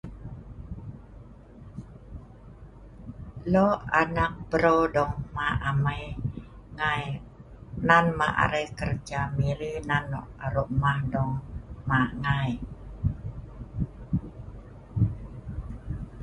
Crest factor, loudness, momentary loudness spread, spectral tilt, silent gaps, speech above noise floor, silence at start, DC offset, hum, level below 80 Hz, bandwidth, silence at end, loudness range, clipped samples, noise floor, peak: 26 dB; -27 LUFS; 21 LU; -7 dB/octave; none; 21 dB; 0.05 s; under 0.1%; none; -42 dBFS; 11 kHz; 0 s; 8 LU; under 0.1%; -47 dBFS; -4 dBFS